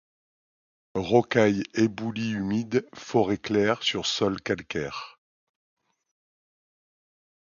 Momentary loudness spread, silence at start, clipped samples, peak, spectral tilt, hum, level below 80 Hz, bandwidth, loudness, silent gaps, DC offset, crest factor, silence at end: 10 LU; 0.95 s; under 0.1%; -6 dBFS; -5 dB/octave; none; -58 dBFS; 7.4 kHz; -26 LUFS; none; under 0.1%; 22 dB; 2.45 s